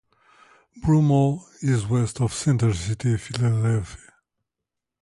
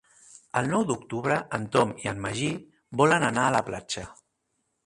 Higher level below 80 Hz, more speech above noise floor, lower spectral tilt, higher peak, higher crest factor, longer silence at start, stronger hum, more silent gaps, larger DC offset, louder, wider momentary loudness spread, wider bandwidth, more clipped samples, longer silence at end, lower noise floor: first, -46 dBFS vs -58 dBFS; first, 63 dB vs 51 dB; first, -6.5 dB/octave vs -5 dB/octave; about the same, -8 dBFS vs -6 dBFS; second, 16 dB vs 22 dB; first, 0.75 s vs 0.55 s; neither; neither; neither; first, -23 LUFS vs -26 LUFS; second, 8 LU vs 12 LU; about the same, 11.5 kHz vs 11.5 kHz; neither; first, 1.1 s vs 0.7 s; first, -85 dBFS vs -77 dBFS